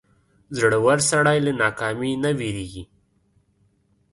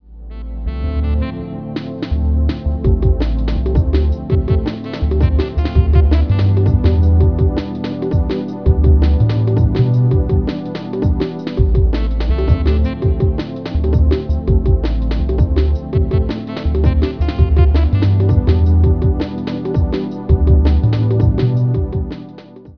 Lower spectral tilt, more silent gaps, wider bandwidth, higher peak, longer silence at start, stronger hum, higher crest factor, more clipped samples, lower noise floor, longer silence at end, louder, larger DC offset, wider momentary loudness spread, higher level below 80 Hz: second, -4.5 dB/octave vs -10 dB/octave; neither; first, 11.5 kHz vs 5.4 kHz; second, -4 dBFS vs 0 dBFS; first, 0.5 s vs 0.1 s; neither; about the same, 18 dB vs 14 dB; neither; first, -64 dBFS vs -36 dBFS; first, 1.3 s vs 0.05 s; second, -21 LUFS vs -16 LUFS; second, under 0.1% vs 0.4%; first, 15 LU vs 9 LU; second, -52 dBFS vs -18 dBFS